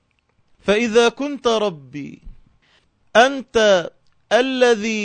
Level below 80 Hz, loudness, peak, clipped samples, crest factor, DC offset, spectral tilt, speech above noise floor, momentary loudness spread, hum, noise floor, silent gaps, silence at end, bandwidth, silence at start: -50 dBFS; -17 LUFS; -2 dBFS; under 0.1%; 18 dB; under 0.1%; -3.5 dB/octave; 46 dB; 18 LU; none; -63 dBFS; none; 0 s; 9.2 kHz; 0.65 s